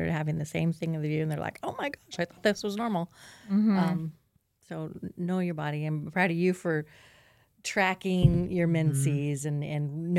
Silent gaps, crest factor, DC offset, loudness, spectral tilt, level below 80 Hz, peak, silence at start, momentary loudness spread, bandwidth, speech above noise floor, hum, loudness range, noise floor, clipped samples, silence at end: none; 20 dB; under 0.1%; -29 LUFS; -6.5 dB/octave; -50 dBFS; -8 dBFS; 0 s; 12 LU; 14.5 kHz; 38 dB; none; 3 LU; -66 dBFS; under 0.1%; 0 s